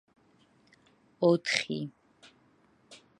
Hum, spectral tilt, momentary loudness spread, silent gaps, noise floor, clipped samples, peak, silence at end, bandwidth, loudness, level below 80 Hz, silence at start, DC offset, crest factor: none; -4.5 dB/octave; 12 LU; none; -65 dBFS; under 0.1%; -6 dBFS; 0.25 s; 11.5 kHz; -29 LUFS; -78 dBFS; 1.2 s; under 0.1%; 28 dB